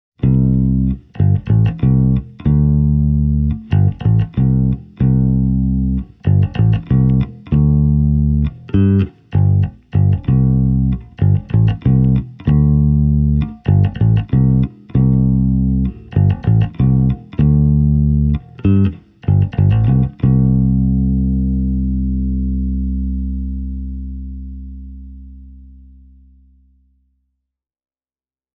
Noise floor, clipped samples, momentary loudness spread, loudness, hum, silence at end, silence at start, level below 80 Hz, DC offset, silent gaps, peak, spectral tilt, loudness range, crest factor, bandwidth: under -90 dBFS; under 0.1%; 7 LU; -15 LUFS; none; 3 s; 0.2 s; -22 dBFS; under 0.1%; none; -2 dBFS; -12.5 dB/octave; 7 LU; 12 dB; 3.8 kHz